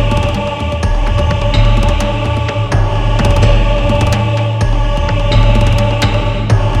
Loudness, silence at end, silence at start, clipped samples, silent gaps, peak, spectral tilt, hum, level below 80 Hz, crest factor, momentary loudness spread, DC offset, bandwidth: -13 LUFS; 0 s; 0 s; under 0.1%; none; 0 dBFS; -6.5 dB/octave; none; -14 dBFS; 10 dB; 4 LU; under 0.1%; 11 kHz